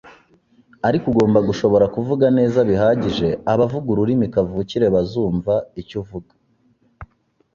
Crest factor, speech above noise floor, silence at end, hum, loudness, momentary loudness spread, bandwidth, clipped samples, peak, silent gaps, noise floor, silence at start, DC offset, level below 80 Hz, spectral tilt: 16 dB; 43 dB; 0.5 s; none; -18 LUFS; 10 LU; 7.4 kHz; under 0.1%; -2 dBFS; none; -60 dBFS; 0.05 s; under 0.1%; -46 dBFS; -8 dB/octave